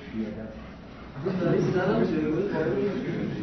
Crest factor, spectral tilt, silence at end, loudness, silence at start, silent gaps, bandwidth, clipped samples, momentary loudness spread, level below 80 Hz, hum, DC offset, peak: 16 dB; -8.5 dB/octave; 0 s; -27 LUFS; 0 s; none; 6.4 kHz; under 0.1%; 18 LU; -50 dBFS; none; under 0.1%; -12 dBFS